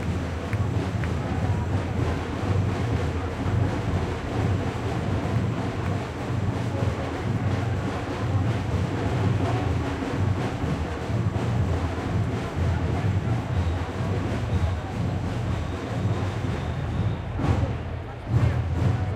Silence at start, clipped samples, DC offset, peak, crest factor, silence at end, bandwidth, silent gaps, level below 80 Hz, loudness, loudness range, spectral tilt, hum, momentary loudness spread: 0 s; under 0.1%; under 0.1%; -10 dBFS; 16 dB; 0 s; 10.5 kHz; none; -38 dBFS; -27 LUFS; 1 LU; -7.5 dB/octave; none; 4 LU